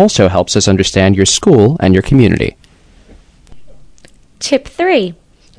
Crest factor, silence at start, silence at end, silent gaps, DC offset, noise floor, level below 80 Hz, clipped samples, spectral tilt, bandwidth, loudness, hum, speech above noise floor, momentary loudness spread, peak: 12 dB; 0 s; 0.45 s; none; under 0.1%; -44 dBFS; -34 dBFS; 1%; -5 dB/octave; 11 kHz; -11 LUFS; none; 34 dB; 8 LU; 0 dBFS